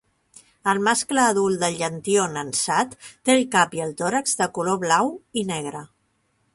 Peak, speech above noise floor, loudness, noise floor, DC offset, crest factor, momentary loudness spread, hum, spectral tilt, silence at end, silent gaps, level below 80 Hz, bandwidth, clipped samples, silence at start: -4 dBFS; 46 dB; -22 LUFS; -68 dBFS; under 0.1%; 20 dB; 9 LU; none; -3 dB/octave; 0.7 s; none; -64 dBFS; 12 kHz; under 0.1%; 0.65 s